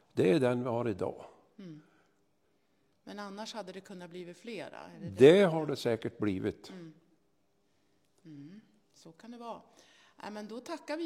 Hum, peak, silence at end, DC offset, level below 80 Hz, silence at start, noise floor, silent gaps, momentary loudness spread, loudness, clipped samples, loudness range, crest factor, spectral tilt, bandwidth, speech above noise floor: none; -8 dBFS; 0 s; under 0.1%; -78 dBFS; 0.15 s; -75 dBFS; none; 26 LU; -29 LUFS; under 0.1%; 22 LU; 26 dB; -6.5 dB/octave; 13 kHz; 44 dB